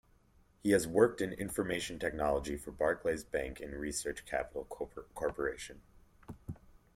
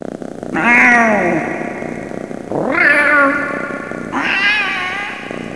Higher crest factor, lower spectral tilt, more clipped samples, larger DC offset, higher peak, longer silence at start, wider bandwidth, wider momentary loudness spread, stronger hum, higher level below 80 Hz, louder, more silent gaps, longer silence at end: first, 24 dB vs 16 dB; about the same, -4.5 dB/octave vs -4.5 dB/octave; neither; second, under 0.1% vs 0.4%; second, -12 dBFS vs 0 dBFS; first, 0.65 s vs 0.05 s; first, 16.5 kHz vs 11 kHz; about the same, 18 LU vs 16 LU; neither; about the same, -54 dBFS vs -52 dBFS; second, -35 LUFS vs -13 LUFS; neither; first, 0.2 s vs 0 s